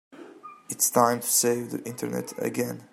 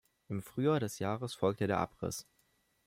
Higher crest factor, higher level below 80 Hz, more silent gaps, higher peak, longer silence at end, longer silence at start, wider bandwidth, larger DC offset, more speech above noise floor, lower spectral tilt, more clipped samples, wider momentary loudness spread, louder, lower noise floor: about the same, 22 dB vs 20 dB; about the same, -74 dBFS vs -70 dBFS; neither; first, -6 dBFS vs -16 dBFS; second, 0.05 s vs 0.65 s; second, 0.1 s vs 0.3 s; about the same, 16.5 kHz vs 16 kHz; neither; second, 20 dB vs 40 dB; second, -3 dB/octave vs -6 dB/octave; neither; first, 15 LU vs 11 LU; first, -25 LUFS vs -35 LUFS; second, -46 dBFS vs -74 dBFS